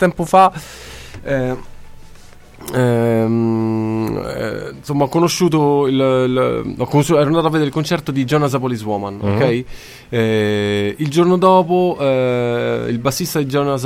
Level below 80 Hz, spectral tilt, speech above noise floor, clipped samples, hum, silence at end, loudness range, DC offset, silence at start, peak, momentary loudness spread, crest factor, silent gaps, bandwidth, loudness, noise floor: -44 dBFS; -6 dB/octave; 23 dB; under 0.1%; none; 0 s; 4 LU; under 0.1%; 0 s; 0 dBFS; 11 LU; 16 dB; none; 16.5 kHz; -16 LUFS; -39 dBFS